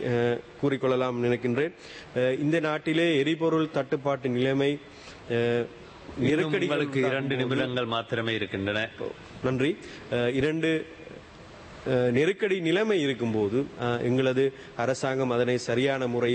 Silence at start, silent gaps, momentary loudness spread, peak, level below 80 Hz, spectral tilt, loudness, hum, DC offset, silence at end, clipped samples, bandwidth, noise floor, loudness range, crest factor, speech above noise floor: 0 s; none; 12 LU; -12 dBFS; -60 dBFS; -6 dB/octave; -27 LUFS; none; under 0.1%; 0 s; under 0.1%; 8.8 kHz; -47 dBFS; 3 LU; 16 dB; 20 dB